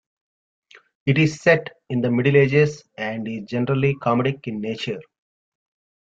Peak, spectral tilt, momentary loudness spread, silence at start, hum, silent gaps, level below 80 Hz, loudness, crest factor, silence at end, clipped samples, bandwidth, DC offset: -2 dBFS; -7 dB/octave; 12 LU; 1.05 s; none; none; -60 dBFS; -21 LUFS; 20 dB; 1 s; under 0.1%; 7.8 kHz; under 0.1%